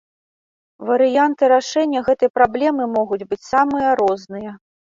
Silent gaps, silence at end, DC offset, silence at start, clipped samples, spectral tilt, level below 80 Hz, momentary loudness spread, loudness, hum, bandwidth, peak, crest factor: 2.30-2.34 s; 0.3 s; under 0.1%; 0.8 s; under 0.1%; -4.5 dB/octave; -56 dBFS; 11 LU; -17 LUFS; none; 7.6 kHz; -2 dBFS; 16 dB